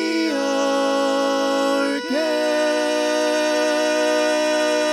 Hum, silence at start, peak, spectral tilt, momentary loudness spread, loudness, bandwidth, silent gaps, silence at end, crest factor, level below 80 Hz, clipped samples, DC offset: none; 0 s; -8 dBFS; -1.5 dB/octave; 2 LU; -20 LUFS; 14 kHz; none; 0 s; 12 dB; -70 dBFS; under 0.1%; under 0.1%